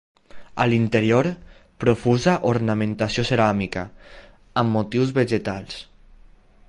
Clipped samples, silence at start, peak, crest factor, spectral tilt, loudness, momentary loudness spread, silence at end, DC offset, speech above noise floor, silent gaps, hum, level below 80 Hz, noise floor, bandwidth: under 0.1%; 0.35 s; -4 dBFS; 18 dB; -6.5 dB/octave; -21 LUFS; 13 LU; 0.85 s; under 0.1%; 29 dB; none; none; -48 dBFS; -50 dBFS; 11 kHz